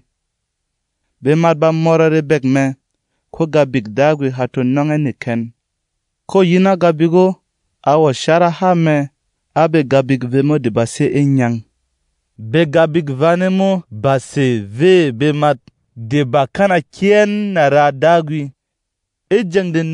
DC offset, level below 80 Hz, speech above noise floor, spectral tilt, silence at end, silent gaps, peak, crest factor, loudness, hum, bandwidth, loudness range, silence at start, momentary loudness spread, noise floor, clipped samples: under 0.1%; -56 dBFS; 62 dB; -7 dB/octave; 0 s; none; 0 dBFS; 14 dB; -14 LUFS; none; 11 kHz; 2 LU; 1.2 s; 9 LU; -76 dBFS; under 0.1%